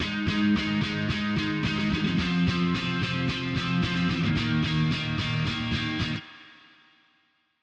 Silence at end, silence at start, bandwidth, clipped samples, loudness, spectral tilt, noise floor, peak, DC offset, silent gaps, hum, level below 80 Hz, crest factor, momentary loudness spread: 1.1 s; 0 s; 8.6 kHz; under 0.1%; -26 LUFS; -6 dB/octave; -69 dBFS; -14 dBFS; under 0.1%; none; none; -46 dBFS; 14 dB; 3 LU